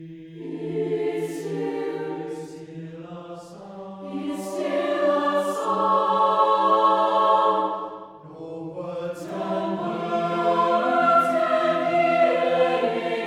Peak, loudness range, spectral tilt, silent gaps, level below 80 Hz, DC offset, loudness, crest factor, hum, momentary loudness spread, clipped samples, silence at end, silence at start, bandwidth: -8 dBFS; 10 LU; -5.5 dB/octave; none; -72 dBFS; under 0.1%; -22 LUFS; 16 dB; none; 19 LU; under 0.1%; 0 s; 0 s; 15 kHz